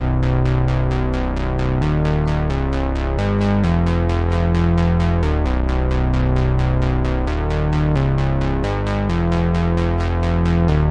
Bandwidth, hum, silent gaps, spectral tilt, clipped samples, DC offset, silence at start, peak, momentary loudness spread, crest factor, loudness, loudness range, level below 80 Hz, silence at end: 8.6 kHz; none; none; -8.5 dB/octave; under 0.1%; under 0.1%; 0 s; -8 dBFS; 4 LU; 8 dB; -19 LUFS; 1 LU; -22 dBFS; 0 s